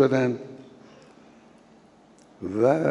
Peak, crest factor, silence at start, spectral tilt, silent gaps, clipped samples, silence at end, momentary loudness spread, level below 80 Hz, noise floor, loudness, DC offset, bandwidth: -8 dBFS; 18 dB; 0 s; -7.5 dB/octave; none; under 0.1%; 0 s; 25 LU; -74 dBFS; -54 dBFS; -25 LUFS; under 0.1%; 10.5 kHz